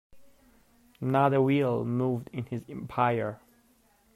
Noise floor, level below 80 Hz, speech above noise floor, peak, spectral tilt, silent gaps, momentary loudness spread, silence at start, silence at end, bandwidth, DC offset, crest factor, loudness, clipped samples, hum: -65 dBFS; -64 dBFS; 37 dB; -12 dBFS; -8.5 dB/octave; none; 13 LU; 0.15 s; 0.8 s; 14 kHz; under 0.1%; 18 dB; -28 LUFS; under 0.1%; none